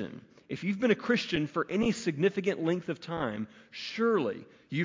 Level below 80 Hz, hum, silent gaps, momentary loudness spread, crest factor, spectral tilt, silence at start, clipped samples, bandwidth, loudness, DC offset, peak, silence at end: -64 dBFS; none; none; 13 LU; 18 dB; -6 dB/octave; 0 s; under 0.1%; 7.6 kHz; -31 LUFS; under 0.1%; -12 dBFS; 0 s